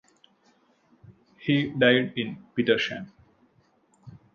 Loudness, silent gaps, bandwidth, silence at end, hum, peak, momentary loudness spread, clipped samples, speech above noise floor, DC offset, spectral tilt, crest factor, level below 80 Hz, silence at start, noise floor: -25 LUFS; none; 7.4 kHz; 0.2 s; none; -6 dBFS; 14 LU; under 0.1%; 40 dB; under 0.1%; -6.5 dB/octave; 22 dB; -66 dBFS; 1.4 s; -64 dBFS